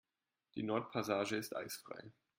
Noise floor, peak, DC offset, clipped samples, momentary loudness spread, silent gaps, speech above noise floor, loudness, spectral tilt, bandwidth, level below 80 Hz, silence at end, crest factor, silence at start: -82 dBFS; -22 dBFS; under 0.1%; under 0.1%; 14 LU; none; 41 dB; -40 LUFS; -4.5 dB/octave; 16.5 kHz; -80 dBFS; 0.25 s; 20 dB; 0.55 s